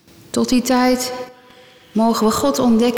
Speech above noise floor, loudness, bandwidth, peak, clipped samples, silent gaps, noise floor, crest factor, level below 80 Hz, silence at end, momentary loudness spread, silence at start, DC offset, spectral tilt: 30 dB; -17 LUFS; 19 kHz; -6 dBFS; under 0.1%; none; -46 dBFS; 10 dB; -48 dBFS; 0 s; 10 LU; 0.35 s; under 0.1%; -4 dB/octave